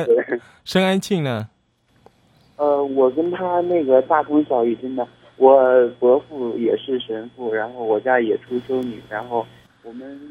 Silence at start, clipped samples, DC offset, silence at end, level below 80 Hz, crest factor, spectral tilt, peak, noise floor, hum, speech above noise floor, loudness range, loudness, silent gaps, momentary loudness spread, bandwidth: 0 s; under 0.1%; under 0.1%; 0 s; -64 dBFS; 20 dB; -6.5 dB/octave; 0 dBFS; -61 dBFS; none; 42 dB; 6 LU; -19 LUFS; none; 13 LU; 14.5 kHz